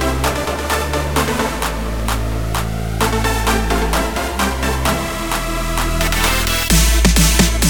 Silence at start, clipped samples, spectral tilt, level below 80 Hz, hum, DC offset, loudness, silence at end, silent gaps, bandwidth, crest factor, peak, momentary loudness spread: 0 s; under 0.1%; -3.5 dB/octave; -20 dBFS; none; 1%; -17 LUFS; 0 s; none; over 20 kHz; 16 dB; 0 dBFS; 8 LU